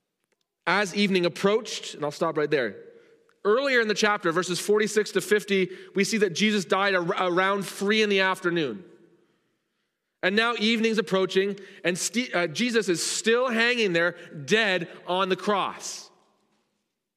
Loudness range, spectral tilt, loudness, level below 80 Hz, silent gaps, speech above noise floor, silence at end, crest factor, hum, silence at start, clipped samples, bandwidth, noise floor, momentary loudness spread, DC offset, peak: 3 LU; -3.5 dB/octave; -24 LUFS; -78 dBFS; none; 54 dB; 1.1 s; 20 dB; none; 0.65 s; under 0.1%; 15.5 kHz; -78 dBFS; 8 LU; under 0.1%; -6 dBFS